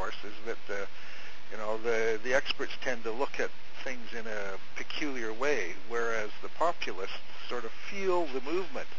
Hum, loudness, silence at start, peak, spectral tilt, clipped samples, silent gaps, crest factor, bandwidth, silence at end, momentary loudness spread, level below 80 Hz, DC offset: none; -34 LUFS; 0 s; -14 dBFS; -4 dB/octave; under 0.1%; none; 22 dB; 8 kHz; 0 s; 11 LU; -66 dBFS; 5%